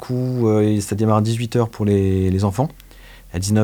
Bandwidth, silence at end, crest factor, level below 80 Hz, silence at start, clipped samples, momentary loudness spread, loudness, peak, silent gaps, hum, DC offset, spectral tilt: 19.5 kHz; 0 s; 16 dB; -48 dBFS; 0 s; under 0.1%; 7 LU; -19 LUFS; -2 dBFS; none; none; under 0.1%; -7 dB/octave